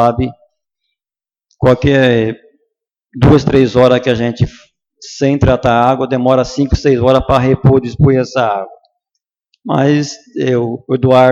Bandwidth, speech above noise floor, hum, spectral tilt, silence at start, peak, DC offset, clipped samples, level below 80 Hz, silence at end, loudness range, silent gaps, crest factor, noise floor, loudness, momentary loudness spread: 7.8 kHz; over 79 dB; none; -7 dB/octave; 0 s; 0 dBFS; under 0.1%; under 0.1%; -30 dBFS; 0 s; 4 LU; none; 12 dB; under -90 dBFS; -12 LUFS; 10 LU